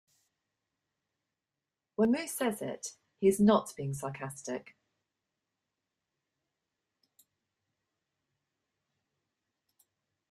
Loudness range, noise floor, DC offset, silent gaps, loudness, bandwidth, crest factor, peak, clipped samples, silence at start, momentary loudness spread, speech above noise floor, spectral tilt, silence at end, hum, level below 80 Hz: 15 LU; -90 dBFS; under 0.1%; none; -31 LUFS; 14.5 kHz; 24 dB; -14 dBFS; under 0.1%; 2 s; 16 LU; 59 dB; -5.5 dB/octave; 5.7 s; none; -72 dBFS